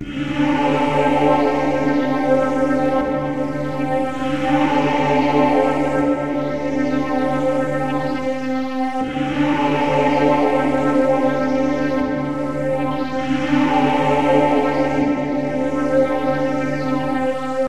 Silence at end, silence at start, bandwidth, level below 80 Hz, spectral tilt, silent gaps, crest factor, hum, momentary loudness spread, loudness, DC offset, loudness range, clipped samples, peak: 0 s; 0 s; 10.5 kHz; -44 dBFS; -7 dB/octave; none; 16 dB; none; 6 LU; -19 LUFS; 3%; 2 LU; under 0.1%; -2 dBFS